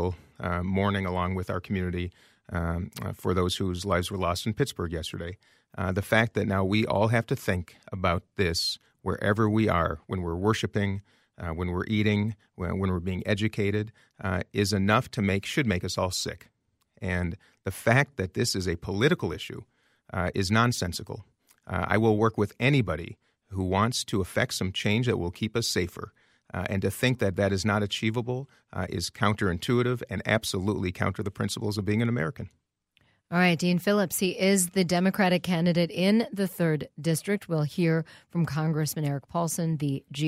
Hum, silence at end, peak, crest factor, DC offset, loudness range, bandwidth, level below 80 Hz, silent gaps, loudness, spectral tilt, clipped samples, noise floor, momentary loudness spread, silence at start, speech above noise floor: none; 0 s; -8 dBFS; 20 dB; under 0.1%; 4 LU; 16 kHz; -52 dBFS; none; -27 LUFS; -5.5 dB/octave; under 0.1%; -69 dBFS; 11 LU; 0 s; 42 dB